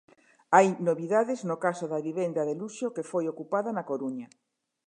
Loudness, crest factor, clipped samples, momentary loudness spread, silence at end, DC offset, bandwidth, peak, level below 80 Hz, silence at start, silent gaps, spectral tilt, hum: -28 LUFS; 24 dB; under 0.1%; 12 LU; 0.6 s; under 0.1%; 10.5 kHz; -4 dBFS; -84 dBFS; 0.5 s; none; -6 dB/octave; none